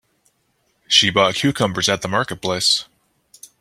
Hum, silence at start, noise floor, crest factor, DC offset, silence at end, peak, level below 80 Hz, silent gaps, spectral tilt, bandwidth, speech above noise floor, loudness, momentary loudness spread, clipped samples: none; 0.9 s; -66 dBFS; 20 dB; under 0.1%; 0.75 s; 0 dBFS; -56 dBFS; none; -3 dB/octave; 16 kHz; 48 dB; -17 LUFS; 8 LU; under 0.1%